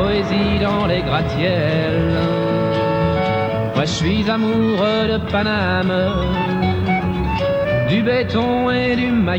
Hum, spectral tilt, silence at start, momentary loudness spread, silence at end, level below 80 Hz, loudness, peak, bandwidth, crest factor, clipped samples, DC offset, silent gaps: none; -7 dB/octave; 0 s; 2 LU; 0 s; -34 dBFS; -18 LUFS; -6 dBFS; 19.5 kHz; 12 dB; under 0.1%; under 0.1%; none